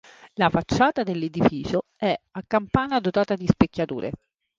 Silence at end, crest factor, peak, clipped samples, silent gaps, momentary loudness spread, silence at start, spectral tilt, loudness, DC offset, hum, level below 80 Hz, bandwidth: 0.45 s; 20 dB; -2 dBFS; under 0.1%; none; 9 LU; 0.25 s; -7 dB/octave; -24 LUFS; under 0.1%; none; -46 dBFS; 7.6 kHz